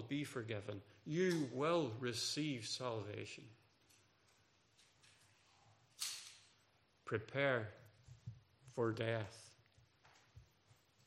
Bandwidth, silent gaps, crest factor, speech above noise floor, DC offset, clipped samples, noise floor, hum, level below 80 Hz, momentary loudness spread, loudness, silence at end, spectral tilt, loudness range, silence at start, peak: 15.5 kHz; none; 22 dB; 34 dB; under 0.1%; under 0.1%; -75 dBFS; none; -82 dBFS; 20 LU; -42 LUFS; 0.65 s; -4.5 dB/octave; 12 LU; 0 s; -22 dBFS